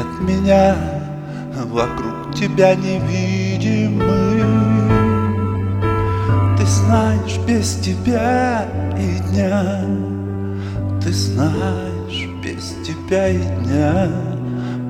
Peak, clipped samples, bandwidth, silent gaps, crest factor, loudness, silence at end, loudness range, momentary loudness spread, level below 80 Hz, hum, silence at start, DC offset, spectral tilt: 0 dBFS; under 0.1%; 12.5 kHz; none; 16 dB; -18 LUFS; 0 s; 4 LU; 10 LU; -36 dBFS; none; 0 s; under 0.1%; -6.5 dB/octave